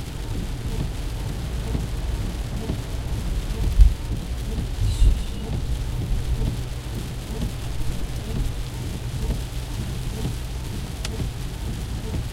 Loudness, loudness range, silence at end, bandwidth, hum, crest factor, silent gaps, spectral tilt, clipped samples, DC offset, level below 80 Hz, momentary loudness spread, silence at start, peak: -28 LUFS; 5 LU; 0 s; 16 kHz; none; 22 dB; none; -5.5 dB/octave; under 0.1%; under 0.1%; -26 dBFS; 8 LU; 0 s; -2 dBFS